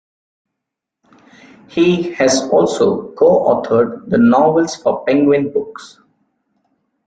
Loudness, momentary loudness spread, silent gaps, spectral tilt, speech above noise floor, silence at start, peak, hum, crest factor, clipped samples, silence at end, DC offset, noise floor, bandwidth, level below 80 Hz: -14 LUFS; 8 LU; none; -5.5 dB/octave; 67 dB; 1.75 s; -2 dBFS; none; 14 dB; under 0.1%; 1.2 s; under 0.1%; -80 dBFS; 9.4 kHz; -56 dBFS